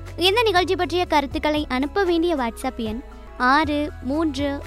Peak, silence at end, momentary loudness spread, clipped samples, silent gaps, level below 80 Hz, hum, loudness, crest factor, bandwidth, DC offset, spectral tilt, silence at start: -4 dBFS; 0 s; 10 LU; under 0.1%; none; -38 dBFS; none; -21 LUFS; 18 dB; 15.5 kHz; under 0.1%; -4.5 dB/octave; 0 s